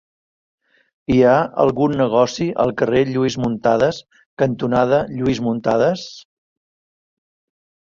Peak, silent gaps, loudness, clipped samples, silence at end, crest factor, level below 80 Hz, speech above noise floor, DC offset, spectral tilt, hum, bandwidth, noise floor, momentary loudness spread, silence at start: -2 dBFS; 4.26-4.37 s; -18 LUFS; under 0.1%; 1.65 s; 18 dB; -48 dBFS; over 73 dB; under 0.1%; -6.5 dB/octave; none; 7.4 kHz; under -90 dBFS; 6 LU; 1.1 s